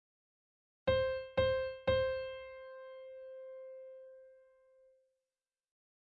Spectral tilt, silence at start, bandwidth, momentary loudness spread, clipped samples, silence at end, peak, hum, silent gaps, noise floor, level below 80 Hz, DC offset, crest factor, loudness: -7 dB/octave; 0.85 s; 5.2 kHz; 18 LU; under 0.1%; 1.65 s; -20 dBFS; none; none; under -90 dBFS; -58 dBFS; under 0.1%; 18 dB; -35 LUFS